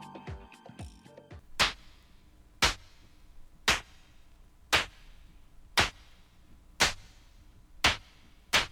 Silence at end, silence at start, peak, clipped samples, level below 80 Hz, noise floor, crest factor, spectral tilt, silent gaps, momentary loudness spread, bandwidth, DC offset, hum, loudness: 0.05 s; 0 s; -8 dBFS; under 0.1%; -50 dBFS; -57 dBFS; 26 dB; -1.5 dB/octave; none; 21 LU; over 20 kHz; under 0.1%; none; -29 LUFS